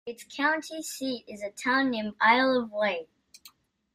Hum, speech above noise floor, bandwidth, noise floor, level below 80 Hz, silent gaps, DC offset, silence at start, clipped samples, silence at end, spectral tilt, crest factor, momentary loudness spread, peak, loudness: none; 30 dB; 15.5 kHz; -58 dBFS; -72 dBFS; none; under 0.1%; 0.05 s; under 0.1%; 0.45 s; -3 dB/octave; 22 dB; 14 LU; -8 dBFS; -27 LUFS